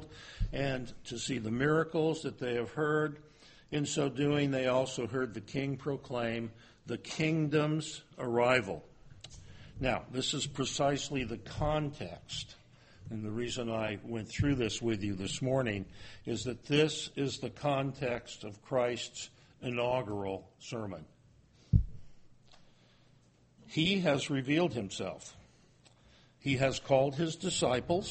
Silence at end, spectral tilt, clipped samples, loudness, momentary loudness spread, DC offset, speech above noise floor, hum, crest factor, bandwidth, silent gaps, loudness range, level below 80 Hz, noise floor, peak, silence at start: 0 s; -5 dB/octave; under 0.1%; -34 LUFS; 15 LU; under 0.1%; 31 dB; none; 22 dB; 8.4 kHz; none; 4 LU; -50 dBFS; -65 dBFS; -12 dBFS; 0 s